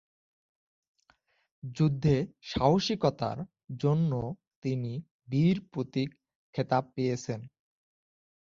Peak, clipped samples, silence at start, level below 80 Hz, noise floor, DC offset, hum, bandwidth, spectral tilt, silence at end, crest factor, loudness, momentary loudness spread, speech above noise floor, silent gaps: -10 dBFS; under 0.1%; 1.65 s; -58 dBFS; -69 dBFS; under 0.1%; none; 7.4 kHz; -7 dB/octave; 1 s; 20 dB; -30 LUFS; 14 LU; 40 dB; 4.56-4.62 s, 5.11-5.19 s, 6.36-6.53 s